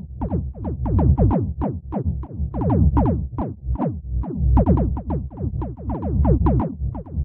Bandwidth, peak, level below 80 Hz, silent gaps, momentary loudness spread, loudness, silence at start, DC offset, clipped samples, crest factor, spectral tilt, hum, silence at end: 2.7 kHz; -4 dBFS; -24 dBFS; none; 11 LU; -22 LUFS; 0 s; under 0.1%; under 0.1%; 16 dB; -13.5 dB/octave; none; 0 s